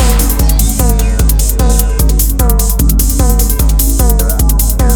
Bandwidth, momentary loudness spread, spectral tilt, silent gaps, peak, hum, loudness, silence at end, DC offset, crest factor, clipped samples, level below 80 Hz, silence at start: over 20 kHz; 1 LU; -5 dB/octave; none; 0 dBFS; none; -11 LUFS; 0 s; under 0.1%; 8 dB; under 0.1%; -10 dBFS; 0 s